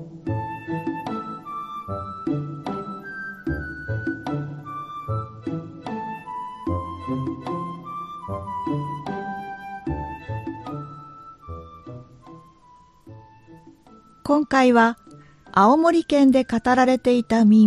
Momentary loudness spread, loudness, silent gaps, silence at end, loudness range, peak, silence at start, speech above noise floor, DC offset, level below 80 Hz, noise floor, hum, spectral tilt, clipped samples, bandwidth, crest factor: 18 LU; -24 LUFS; none; 0 s; 17 LU; -4 dBFS; 0 s; 36 dB; under 0.1%; -48 dBFS; -52 dBFS; none; -7 dB/octave; under 0.1%; 11.5 kHz; 20 dB